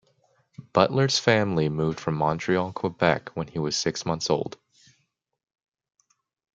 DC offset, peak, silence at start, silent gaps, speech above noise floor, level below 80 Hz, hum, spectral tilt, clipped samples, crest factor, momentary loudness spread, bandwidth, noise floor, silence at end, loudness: under 0.1%; -2 dBFS; 0.6 s; none; 48 dB; -60 dBFS; none; -5 dB/octave; under 0.1%; 24 dB; 8 LU; 9.2 kHz; -72 dBFS; 2.05 s; -25 LUFS